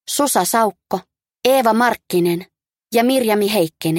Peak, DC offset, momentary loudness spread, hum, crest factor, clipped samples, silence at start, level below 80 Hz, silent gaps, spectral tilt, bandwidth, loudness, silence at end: 0 dBFS; under 0.1%; 10 LU; none; 16 dB; under 0.1%; 0.1 s; -64 dBFS; none; -4 dB/octave; 17 kHz; -17 LUFS; 0 s